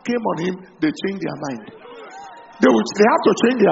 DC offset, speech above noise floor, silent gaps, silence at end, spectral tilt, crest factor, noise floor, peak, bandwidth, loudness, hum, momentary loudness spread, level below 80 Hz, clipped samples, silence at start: under 0.1%; 21 dB; none; 0 s; -4.5 dB/octave; 18 dB; -39 dBFS; 0 dBFS; 8 kHz; -19 LUFS; none; 23 LU; -60 dBFS; under 0.1%; 0.05 s